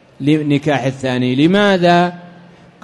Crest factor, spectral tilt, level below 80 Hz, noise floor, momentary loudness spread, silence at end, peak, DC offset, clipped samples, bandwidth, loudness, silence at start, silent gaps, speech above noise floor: 12 dB; -6.5 dB/octave; -54 dBFS; -42 dBFS; 6 LU; 0.55 s; -2 dBFS; under 0.1%; under 0.1%; 11.5 kHz; -14 LUFS; 0.2 s; none; 28 dB